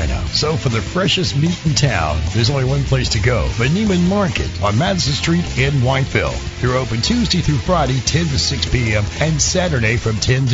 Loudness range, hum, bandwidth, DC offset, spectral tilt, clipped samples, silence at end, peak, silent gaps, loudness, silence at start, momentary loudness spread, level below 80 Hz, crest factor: 1 LU; none; 7.8 kHz; under 0.1%; -4.5 dB/octave; under 0.1%; 0 s; -2 dBFS; none; -17 LUFS; 0 s; 3 LU; -28 dBFS; 14 dB